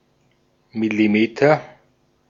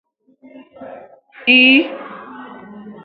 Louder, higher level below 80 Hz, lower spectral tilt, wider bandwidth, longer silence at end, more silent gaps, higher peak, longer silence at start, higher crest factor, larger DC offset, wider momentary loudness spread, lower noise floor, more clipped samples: second, -18 LUFS vs -11 LUFS; first, -64 dBFS vs -70 dBFS; first, -7 dB/octave vs -5.5 dB/octave; first, 7.4 kHz vs 5 kHz; first, 0.65 s vs 0.15 s; neither; about the same, -2 dBFS vs 0 dBFS; about the same, 0.75 s vs 0.8 s; about the same, 20 dB vs 18 dB; neither; second, 9 LU vs 28 LU; first, -62 dBFS vs -41 dBFS; neither